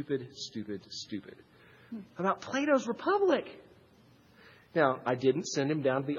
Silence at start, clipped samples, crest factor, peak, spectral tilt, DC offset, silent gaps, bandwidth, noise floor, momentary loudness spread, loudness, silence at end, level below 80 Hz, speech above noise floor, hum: 0 s; under 0.1%; 22 dB; -12 dBFS; -5 dB/octave; under 0.1%; none; 7.6 kHz; -61 dBFS; 14 LU; -31 LUFS; 0 s; -76 dBFS; 30 dB; none